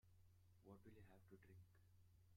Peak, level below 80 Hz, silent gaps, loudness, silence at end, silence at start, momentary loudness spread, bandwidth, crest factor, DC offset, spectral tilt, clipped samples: -50 dBFS; -82 dBFS; none; -68 LUFS; 0 s; 0.05 s; 3 LU; 16 kHz; 18 dB; under 0.1%; -7 dB/octave; under 0.1%